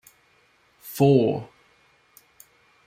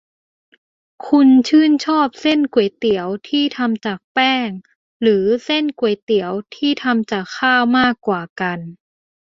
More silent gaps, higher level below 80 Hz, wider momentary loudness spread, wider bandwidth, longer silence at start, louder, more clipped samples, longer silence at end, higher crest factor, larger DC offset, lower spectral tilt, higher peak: second, none vs 4.04-4.15 s, 4.76-5.00 s, 6.02-6.07 s, 8.29-8.36 s; second, -64 dBFS vs -58 dBFS; first, 27 LU vs 10 LU; first, 16.5 kHz vs 7.6 kHz; second, 0.85 s vs 1.05 s; second, -21 LUFS vs -17 LUFS; neither; first, 1.4 s vs 0.6 s; about the same, 20 dB vs 16 dB; neither; first, -7.5 dB/octave vs -5.5 dB/octave; second, -6 dBFS vs -2 dBFS